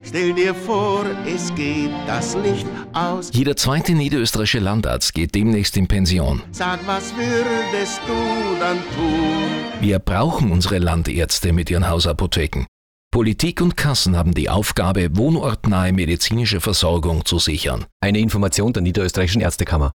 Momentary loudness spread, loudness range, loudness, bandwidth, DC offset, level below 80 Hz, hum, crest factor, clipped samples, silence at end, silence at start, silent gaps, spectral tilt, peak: 5 LU; 3 LU; -19 LUFS; over 20 kHz; under 0.1%; -32 dBFS; none; 10 dB; under 0.1%; 0.05 s; 0 s; 12.68-13.11 s, 17.92-18.00 s; -5 dB/octave; -8 dBFS